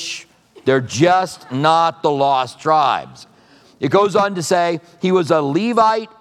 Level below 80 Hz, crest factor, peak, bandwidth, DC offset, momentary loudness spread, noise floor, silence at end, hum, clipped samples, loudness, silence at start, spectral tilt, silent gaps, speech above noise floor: -66 dBFS; 16 dB; 0 dBFS; 13.5 kHz; under 0.1%; 9 LU; -49 dBFS; 0.15 s; none; under 0.1%; -17 LUFS; 0 s; -5 dB/octave; none; 33 dB